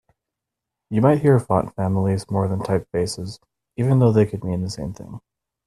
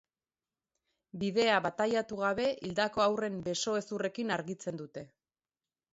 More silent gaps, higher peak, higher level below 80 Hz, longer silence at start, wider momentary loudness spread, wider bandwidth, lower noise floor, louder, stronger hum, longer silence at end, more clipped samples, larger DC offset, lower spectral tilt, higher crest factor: neither; first, -2 dBFS vs -14 dBFS; first, -50 dBFS vs -70 dBFS; second, 0.9 s vs 1.15 s; first, 17 LU vs 12 LU; first, 12.5 kHz vs 8 kHz; second, -84 dBFS vs under -90 dBFS; first, -21 LUFS vs -32 LUFS; neither; second, 0.5 s vs 0.9 s; neither; neither; first, -7.5 dB/octave vs -4 dB/octave; about the same, 20 dB vs 20 dB